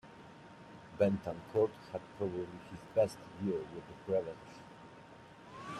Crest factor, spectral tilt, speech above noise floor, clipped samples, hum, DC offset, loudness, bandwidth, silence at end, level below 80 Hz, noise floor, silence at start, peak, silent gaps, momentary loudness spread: 22 dB; -7.5 dB/octave; 19 dB; under 0.1%; none; under 0.1%; -37 LUFS; 12.5 kHz; 0 s; -70 dBFS; -55 dBFS; 0.05 s; -16 dBFS; none; 21 LU